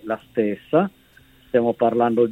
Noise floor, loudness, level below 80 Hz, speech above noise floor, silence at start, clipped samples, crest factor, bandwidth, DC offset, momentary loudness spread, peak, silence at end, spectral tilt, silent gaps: -53 dBFS; -21 LUFS; -60 dBFS; 33 dB; 0.05 s; under 0.1%; 16 dB; 4.1 kHz; under 0.1%; 6 LU; -4 dBFS; 0 s; -8.5 dB/octave; none